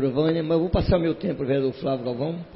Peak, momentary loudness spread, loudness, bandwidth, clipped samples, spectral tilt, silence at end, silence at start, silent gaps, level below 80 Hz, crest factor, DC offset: -8 dBFS; 6 LU; -24 LUFS; 5.8 kHz; under 0.1%; -12 dB/octave; 0 s; 0 s; none; -38 dBFS; 16 dB; under 0.1%